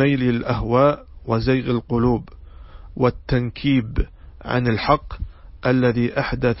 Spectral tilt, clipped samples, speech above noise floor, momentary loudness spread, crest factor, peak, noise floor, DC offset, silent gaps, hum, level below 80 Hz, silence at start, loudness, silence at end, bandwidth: -11 dB/octave; under 0.1%; 20 dB; 13 LU; 18 dB; -2 dBFS; -39 dBFS; under 0.1%; none; none; -34 dBFS; 0 s; -21 LUFS; 0 s; 5.8 kHz